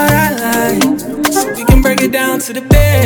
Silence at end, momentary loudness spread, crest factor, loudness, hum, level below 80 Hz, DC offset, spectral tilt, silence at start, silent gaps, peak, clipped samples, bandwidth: 0 s; 5 LU; 10 dB; -12 LUFS; none; -18 dBFS; under 0.1%; -5 dB/octave; 0 s; none; 0 dBFS; 0.2%; over 20 kHz